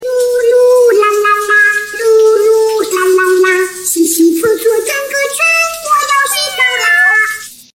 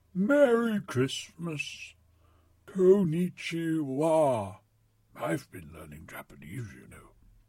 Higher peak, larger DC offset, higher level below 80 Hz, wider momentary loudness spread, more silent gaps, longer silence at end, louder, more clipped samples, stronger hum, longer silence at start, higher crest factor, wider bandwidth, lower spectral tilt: first, 0 dBFS vs -10 dBFS; neither; first, -56 dBFS vs -64 dBFS; second, 6 LU vs 22 LU; neither; second, 0.2 s vs 0.5 s; first, -10 LUFS vs -28 LUFS; neither; neither; second, 0 s vs 0.15 s; second, 10 dB vs 18 dB; about the same, 16.5 kHz vs 16 kHz; second, -1 dB/octave vs -6.5 dB/octave